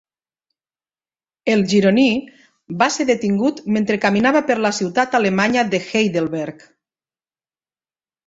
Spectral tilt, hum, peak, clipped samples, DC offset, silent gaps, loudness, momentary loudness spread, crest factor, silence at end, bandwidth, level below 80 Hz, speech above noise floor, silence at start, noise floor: -5 dB/octave; none; -2 dBFS; under 0.1%; under 0.1%; none; -18 LUFS; 9 LU; 18 dB; 1.75 s; 8 kHz; -58 dBFS; over 73 dB; 1.45 s; under -90 dBFS